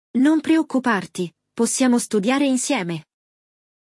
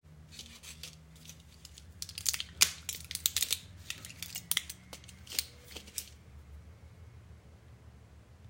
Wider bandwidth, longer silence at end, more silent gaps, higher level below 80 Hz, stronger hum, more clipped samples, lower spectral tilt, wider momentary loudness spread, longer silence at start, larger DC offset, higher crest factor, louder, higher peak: second, 12 kHz vs 16.5 kHz; first, 0.8 s vs 0 s; neither; second, -72 dBFS vs -60 dBFS; neither; neither; first, -4 dB/octave vs 0 dB/octave; second, 12 LU vs 26 LU; about the same, 0.15 s vs 0.05 s; neither; second, 14 dB vs 38 dB; first, -20 LUFS vs -34 LUFS; second, -6 dBFS vs -2 dBFS